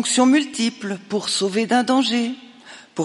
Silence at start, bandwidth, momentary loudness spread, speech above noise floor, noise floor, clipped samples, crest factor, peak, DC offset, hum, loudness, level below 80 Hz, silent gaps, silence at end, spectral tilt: 0 s; 11.5 kHz; 13 LU; 24 dB; -44 dBFS; under 0.1%; 16 dB; -4 dBFS; under 0.1%; none; -20 LUFS; -74 dBFS; none; 0 s; -3 dB/octave